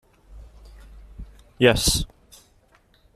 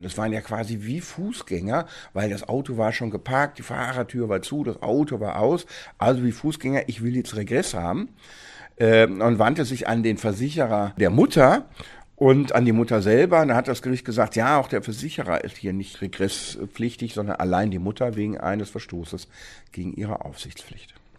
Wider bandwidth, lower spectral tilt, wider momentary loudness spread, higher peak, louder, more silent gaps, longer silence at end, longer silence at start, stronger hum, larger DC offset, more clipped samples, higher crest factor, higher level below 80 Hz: first, 15 kHz vs 13.5 kHz; second, -3.5 dB/octave vs -6 dB/octave; first, 27 LU vs 16 LU; second, -4 dBFS vs 0 dBFS; first, -20 LUFS vs -23 LUFS; neither; first, 1.1 s vs 0.35 s; first, 0.3 s vs 0 s; neither; neither; neither; about the same, 24 dB vs 22 dB; first, -38 dBFS vs -50 dBFS